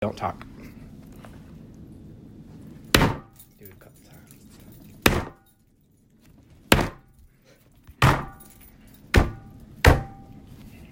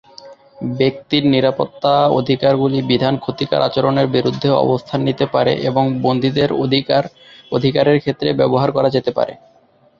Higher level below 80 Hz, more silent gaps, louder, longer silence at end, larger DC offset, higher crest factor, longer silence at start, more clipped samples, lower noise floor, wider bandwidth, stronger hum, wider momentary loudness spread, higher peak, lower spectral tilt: first, -36 dBFS vs -52 dBFS; neither; second, -23 LUFS vs -16 LUFS; first, 0.8 s vs 0.65 s; neither; first, 28 dB vs 14 dB; second, 0 s vs 0.25 s; neither; first, -61 dBFS vs -41 dBFS; first, 16.5 kHz vs 7.2 kHz; neither; first, 26 LU vs 5 LU; about the same, 0 dBFS vs -2 dBFS; second, -4.5 dB/octave vs -8 dB/octave